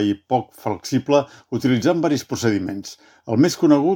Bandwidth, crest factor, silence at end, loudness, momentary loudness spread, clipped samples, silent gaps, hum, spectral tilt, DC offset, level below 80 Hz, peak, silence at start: 17.5 kHz; 18 dB; 0 s; -20 LUFS; 12 LU; under 0.1%; none; none; -6 dB/octave; under 0.1%; -62 dBFS; -2 dBFS; 0 s